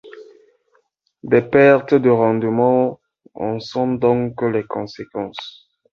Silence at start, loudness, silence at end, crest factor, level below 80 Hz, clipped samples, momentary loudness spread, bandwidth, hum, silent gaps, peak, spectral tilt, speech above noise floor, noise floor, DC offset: 0.05 s; -17 LUFS; 0.45 s; 16 dB; -56 dBFS; under 0.1%; 16 LU; 6.8 kHz; none; none; -2 dBFS; -8 dB/octave; 47 dB; -63 dBFS; under 0.1%